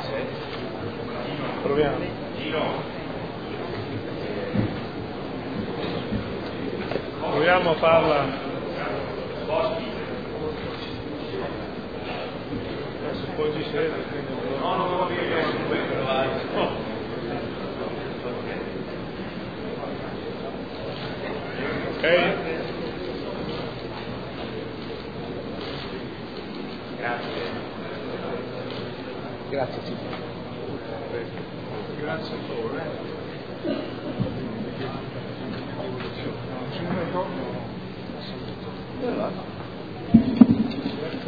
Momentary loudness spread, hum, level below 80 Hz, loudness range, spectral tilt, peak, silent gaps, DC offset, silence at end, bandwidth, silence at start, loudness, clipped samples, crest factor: 11 LU; none; -50 dBFS; 8 LU; -8.5 dB/octave; 0 dBFS; none; 0.4%; 0 s; 5 kHz; 0 s; -28 LUFS; under 0.1%; 28 dB